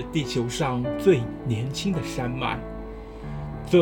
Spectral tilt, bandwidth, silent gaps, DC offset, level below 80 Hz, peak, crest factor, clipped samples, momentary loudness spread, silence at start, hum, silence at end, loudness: -6 dB/octave; 17.5 kHz; none; under 0.1%; -42 dBFS; -6 dBFS; 18 dB; under 0.1%; 15 LU; 0 s; none; 0 s; -26 LUFS